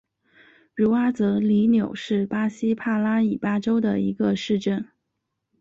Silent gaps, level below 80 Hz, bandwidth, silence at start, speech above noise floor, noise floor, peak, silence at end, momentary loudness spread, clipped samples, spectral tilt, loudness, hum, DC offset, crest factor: none; -60 dBFS; 7.4 kHz; 0.75 s; 57 dB; -79 dBFS; -10 dBFS; 0.75 s; 6 LU; under 0.1%; -7.5 dB/octave; -23 LUFS; none; under 0.1%; 14 dB